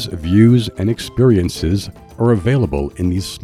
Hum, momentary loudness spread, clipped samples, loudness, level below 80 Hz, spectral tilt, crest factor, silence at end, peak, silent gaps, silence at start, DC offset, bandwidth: none; 8 LU; under 0.1%; -16 LUFS; -34 dBFS; -7 dB/octave; 14 dB; 0.05 s; -2 dBFS; none; 0 s; under 0.1%; 14 kHz